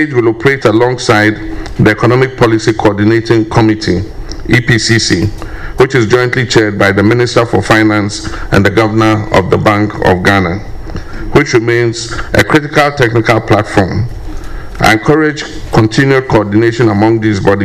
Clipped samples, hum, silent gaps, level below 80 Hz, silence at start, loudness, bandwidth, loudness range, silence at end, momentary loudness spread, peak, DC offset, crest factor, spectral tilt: 0.7%; none; none; -28 dBFS; 0 s; -10 LUFS; 15.5 kHz; 2 LU; 0 s; 11 LU; 0 dBFS; under 0.1%; 10 dB; -6 dB/octave